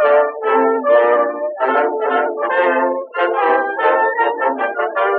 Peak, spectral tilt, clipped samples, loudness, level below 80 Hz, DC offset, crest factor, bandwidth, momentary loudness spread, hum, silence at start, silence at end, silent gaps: -2 dBFS; -5.5 dB/octave; under 0.1%; -16 LUFS; -86 dBFS; under 0.1%; 14 dB; 4.5 kHz; 6 LU; none; 0 s; 0 s; none